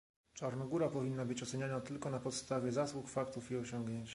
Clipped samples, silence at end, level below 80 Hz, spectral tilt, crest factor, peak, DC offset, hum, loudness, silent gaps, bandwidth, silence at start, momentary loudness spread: under 0.1%; 0 s; -70 dBFS; -5.5 dB/octave; 16 dB; -24 dBFS; under 0.1%; none; -40 LUFS; none; 11.5 kHz; 0.35 s; 6 LU